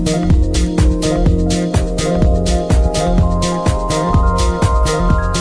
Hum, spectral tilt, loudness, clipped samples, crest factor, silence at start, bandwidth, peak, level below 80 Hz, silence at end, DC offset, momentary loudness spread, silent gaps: none; -6 dB/octave; -15 LUFS; under 0.1%; 10 dB; 0 s; 11 kHz; -2 dBFS; -16 dBFS; 0 s; under 0.1%; 2 LU; none